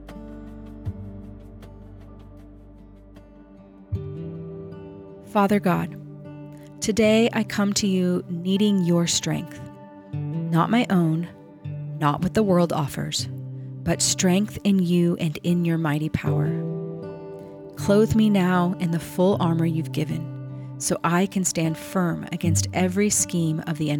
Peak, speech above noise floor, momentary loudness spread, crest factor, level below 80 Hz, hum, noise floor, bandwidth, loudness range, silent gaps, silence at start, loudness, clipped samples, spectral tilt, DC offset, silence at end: -6 dBFS; 25 dB; 20 LU; 16 dB; -52 dBFS; none; -47 dBFS; 18 kHz; 16 LU; none; 0 s; -23 LUFS; under 0.1%; -5 dB/octave; under 0.1%; 0 s